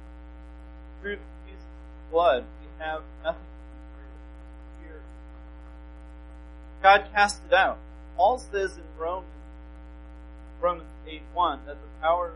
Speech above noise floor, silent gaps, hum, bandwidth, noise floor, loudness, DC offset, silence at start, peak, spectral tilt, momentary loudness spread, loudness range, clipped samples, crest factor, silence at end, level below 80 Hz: 18 dB; none; 60 Hz at -45 dBFS; 11.5 kHz; -44 dBFS; -26 LUFS; under 0.1%; 0 s; -6 dBFS; -4 dB/octave; 24 LU; 15 LU; under 0.1%; 24 dB; 0 s; -44 dBFS